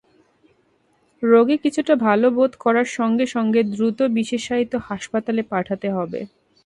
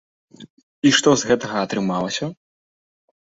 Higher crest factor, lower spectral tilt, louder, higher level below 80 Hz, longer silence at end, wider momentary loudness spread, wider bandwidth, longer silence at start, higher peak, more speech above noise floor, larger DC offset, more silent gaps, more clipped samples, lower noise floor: about the same, 18 dB vs 20 dB; first, -6 dB/octave vs -3.5 dB/octave; about the same, -20 LUFS vs -19 LUFS; about the same, -60 dBFS vs -58 dBFS; second, 0.4 s vs 0.9 s; about the same, 10 LU vs 10 LU; first, 11 kHz vs 8 kHz; first, 1.2 s vs 0.4 s; about the same, -2 dBFS vs -2 dBFS; second, 43 dB vs over 71 dB; neither; second, none vs 0.50-0.57 s, 0.63-0.82 s; neither; second, -62 dBFS vs under -90 dBFS